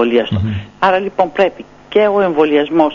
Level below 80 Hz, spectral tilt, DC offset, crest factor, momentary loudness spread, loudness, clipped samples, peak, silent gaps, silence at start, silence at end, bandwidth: -46 dBFS; -4.5 dB/octave; under 0.1%; 14 dB; 5 LU; -14 LUFS; under 0.1%; 0 dBFS; none; 0 s; 0 s; 7.2 kHz